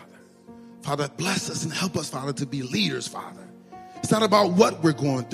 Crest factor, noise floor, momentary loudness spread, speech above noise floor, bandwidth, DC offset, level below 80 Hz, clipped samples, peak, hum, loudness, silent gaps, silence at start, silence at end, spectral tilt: 22 dB; -49 dBFS; 18 LU; 25 dB; 15.5 kHz; under 0.1%; -64 dBFS; under 0.1%; -4 dBFS; none; -24 LUFS; none; 0 s; 0 s; -4.5 dB/octave